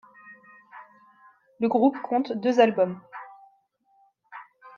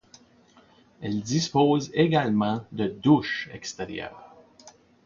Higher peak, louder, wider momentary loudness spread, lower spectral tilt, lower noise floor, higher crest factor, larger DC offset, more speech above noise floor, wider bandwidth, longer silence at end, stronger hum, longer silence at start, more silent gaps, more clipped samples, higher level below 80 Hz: about the same, -6 dBFS vs -8 dBFS; about the same, -23 LUFS vs -25 LUFS; first, 25 LU vs 14 LU; about the same, -6.5 dB/octave vs -5.5 dB/octave; first, -65 dBFS vs -57 dBFS; about the same, 22 dB vs 20 dB; neither; first, 43 dB vs 33 dB; about the same, 7.2 kHz vs 7.4 kHz; second, 0.1 s vs 0.35 s; neither; second, 0.3 s vs 1 s; neither; neither; second, -76 dBFS vs -60 dBFS